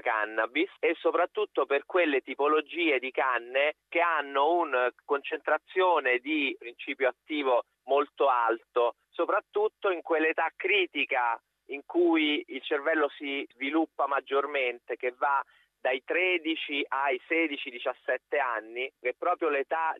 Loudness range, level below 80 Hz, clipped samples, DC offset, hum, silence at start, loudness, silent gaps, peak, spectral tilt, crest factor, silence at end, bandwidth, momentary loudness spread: 2 LU; -86 dBFS; under 0.1%; under 0.1%; none; 0.05 s; -28 LUFS; none; -14 dBFS; -4 dB/octave; 16 dB; 0 s; 4.3 kHz; 7 LU